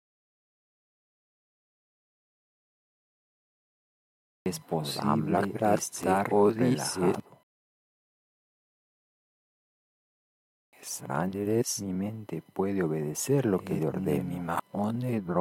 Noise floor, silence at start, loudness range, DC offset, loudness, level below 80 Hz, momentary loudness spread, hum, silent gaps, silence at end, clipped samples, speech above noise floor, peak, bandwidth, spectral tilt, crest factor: under -90 dBFS; 4.45 s; 12 LU; under 0.1%; -29 LUFS; -68 dBFS; 11 LU; none; 7.43-10.72 s; 0 s; under 0.1%; over 62 dB; -10 dBFS; 16.5 kHz; -5.5 dB/octave; 22 dB